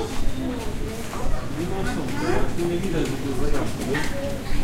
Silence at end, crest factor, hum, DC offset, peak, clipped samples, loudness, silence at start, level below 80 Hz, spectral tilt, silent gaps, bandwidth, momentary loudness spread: 0 s; 14 dB; none; under 0.1%; -8 dBFS; under 0.1%; -27 LUFS; 0 s; -28 dBFS; -5.5 dB/octave; none; 15 kHz; 5 LU